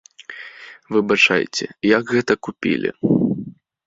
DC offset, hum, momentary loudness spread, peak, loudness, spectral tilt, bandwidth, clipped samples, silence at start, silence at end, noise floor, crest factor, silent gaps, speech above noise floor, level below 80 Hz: under 0.1%; none; 21 LU; 0 dBFS; -19 LUFS; -5 dB/octave; 7.8 kHz; under 0.1%; 0.3 s; 0.35 s; -39 dBFS; 20 dB; none; 21 dB; -58 dBFS